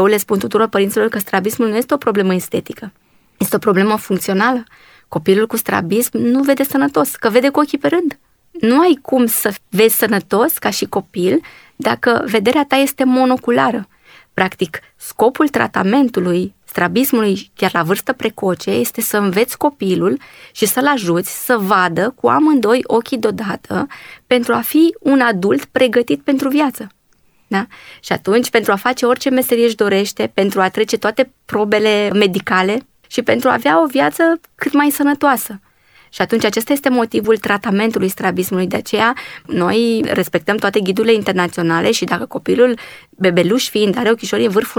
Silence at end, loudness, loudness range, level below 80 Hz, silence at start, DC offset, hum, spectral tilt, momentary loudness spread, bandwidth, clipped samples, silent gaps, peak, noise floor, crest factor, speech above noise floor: 0 s; -15 LUFS; 2 LU; -56 dBFS; 0 s; under 0.1%; none; -4.5 dB/octave; 8 LU; over 20 kHz; under 0.1%; none; 0 dBFS; -55 dBFS; 14 dB; 40 dB